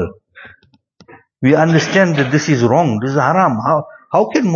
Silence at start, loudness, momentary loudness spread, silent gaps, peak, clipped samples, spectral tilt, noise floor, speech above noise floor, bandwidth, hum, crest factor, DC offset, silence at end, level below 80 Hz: 0 s; -14 LUFS; 6 LU; none; 0 dBFS; under 0.1%; -6.5 dB/octave; -50 dBFS; 37 dB; 7.2 kHz; none; 14 dB; under 0.1%; 0 s; -52 dBFS